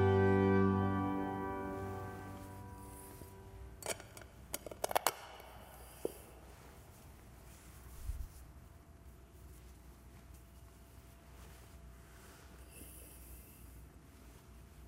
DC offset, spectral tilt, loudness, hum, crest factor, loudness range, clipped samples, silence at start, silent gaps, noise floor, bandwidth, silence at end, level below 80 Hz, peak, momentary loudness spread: under 0.1%; -5.5 dB/octave; -38 LUFS; none; 30 dB; 18 LU; under 0.1%; 0 s; none; -58 dBFS; 16 kHz; 0 s; -56 dBFS; -10 dBFS; 24 LU